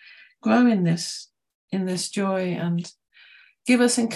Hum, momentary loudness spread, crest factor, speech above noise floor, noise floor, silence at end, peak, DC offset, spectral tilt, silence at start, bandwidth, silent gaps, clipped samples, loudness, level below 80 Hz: none; 13 LU; 16 dB; 31 dB; -53 dBFS; 0 s; -8 dBFS; under 0.1%; -5 dB/octave; 0.45 s; 12.5 kHz; 1.55-1.68 s; under 0.1%; -23 LUFS; -72 dBFS